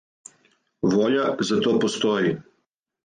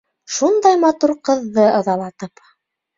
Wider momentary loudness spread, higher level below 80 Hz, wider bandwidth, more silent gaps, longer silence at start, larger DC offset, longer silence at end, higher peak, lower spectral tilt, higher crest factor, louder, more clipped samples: second, 6 LU vs 16 LU; about the same, -64 dBFS vs -64 dBFS; first, 9.6 kHz vs 7.8 kHz; neither; first, 0.85 s vs 0.3 s; neither; about the same, 0.6 s vs 0.7 s; second, -10 dBFS vs -2 dBFS; about the same, -5 dB/octave vs -4.5 dB/octave; about the same, 14 dB vs 16 dB; second, -22 LUFS vs -16 LUFS; neither